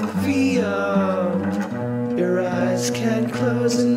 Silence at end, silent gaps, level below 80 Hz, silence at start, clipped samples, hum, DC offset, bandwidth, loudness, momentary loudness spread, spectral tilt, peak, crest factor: 0 s; none; -62 dBFS; 0 s; under 0.1%; none; under 0.1%; 16 kHz; -21 LUFS; 5 LU; -6 dB/octave; -8 dBFS; 12 dB